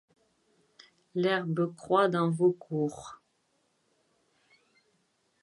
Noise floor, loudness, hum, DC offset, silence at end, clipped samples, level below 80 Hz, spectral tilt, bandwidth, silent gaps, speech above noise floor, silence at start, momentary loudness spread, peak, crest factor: -74 dBFS; -29 LUFS; none; under 0.1%; 2.3 s; under 0.1%; -76 dBFS; -7 dB/octave; 11.5 kHz; none; 46 dB; 1.15 s; 12 LU; -12 dBFS; 20 dB